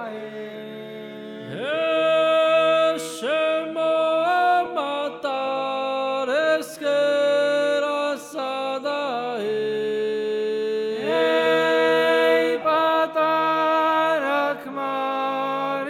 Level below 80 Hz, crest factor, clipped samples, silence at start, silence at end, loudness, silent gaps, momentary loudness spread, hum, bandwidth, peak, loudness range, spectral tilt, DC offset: -76 dBFS; 14 dB; under 0.1%; 0 s; 0 s; -22 LUFS; none; 10 LU; none; 15.5 kHz; -8 dBFS; 4 LU; -3.5 dB/octave; under 0.1%